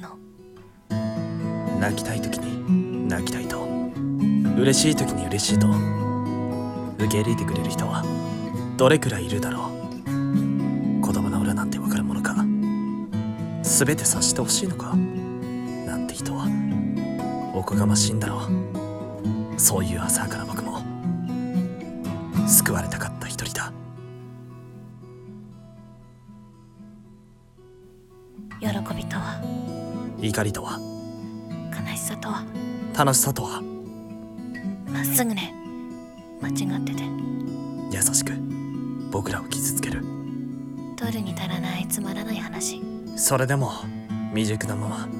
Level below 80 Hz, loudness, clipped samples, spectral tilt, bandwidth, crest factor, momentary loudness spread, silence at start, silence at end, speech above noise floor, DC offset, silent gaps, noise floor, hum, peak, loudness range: -52 dBFS; -25 LUFS; under 0.1%; -4.5 dB/octave; 17.5 kHz; 22 dB; 15 LU; 0 s; 0 s; 28 dB; under 0.1%; none; -51 dBFS; none; -2 dBFS; 8 LU